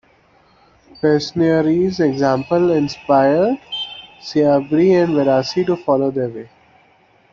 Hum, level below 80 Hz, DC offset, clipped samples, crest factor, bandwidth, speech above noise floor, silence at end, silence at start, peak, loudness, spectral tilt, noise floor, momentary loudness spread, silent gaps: none; -54 dBFS; under 0.1%; under 0.1%; 14 dB; 7.4 kHz; 38 dB; 0.85 s; 1.05 s; -2 dBFS; -16 LUFS; -7 dB/octave; -54 dBFS; 10 LU; none